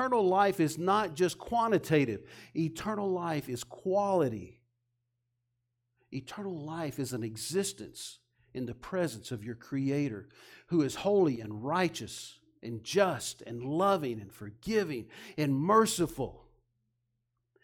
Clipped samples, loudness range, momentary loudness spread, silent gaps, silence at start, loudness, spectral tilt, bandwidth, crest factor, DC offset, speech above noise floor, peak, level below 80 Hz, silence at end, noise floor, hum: under 0.1%; 7 LU; 16 LU; none; 0 s; -31 LUFS; -5.5 dB/octave; 17.5 kHz; 20 dB; under 0.1%; 51 dB; -12 dBFS; -64 dBFS; 1.25 s; -82 dBFS; none